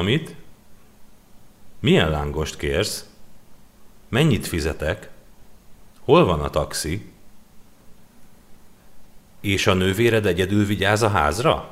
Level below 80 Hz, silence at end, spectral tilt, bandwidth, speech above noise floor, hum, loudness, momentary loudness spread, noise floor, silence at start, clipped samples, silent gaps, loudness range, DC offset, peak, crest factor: -40 dBFS; 0 s; -5 dB/octave; 16 kHz; 25 dB; none; -21 LUFS; 10 LU; -45 dBFS; 0 s; under 0.1%; none; 5 LU; under 0.1%; -2 dBFS; 20 dB